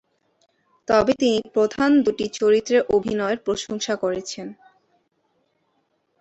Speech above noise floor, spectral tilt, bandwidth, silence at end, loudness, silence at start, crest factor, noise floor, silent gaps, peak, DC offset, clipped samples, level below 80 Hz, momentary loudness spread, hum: 49 dB; -4.5 dB/octave; 8.2 kHz; 1.7 s; -21 LUFS; 0.9 s; 18 dB; -69 dBFS; none; -4 dBFS; under 0.1%; under 0.1%; -56 dBFS; 12 LU; none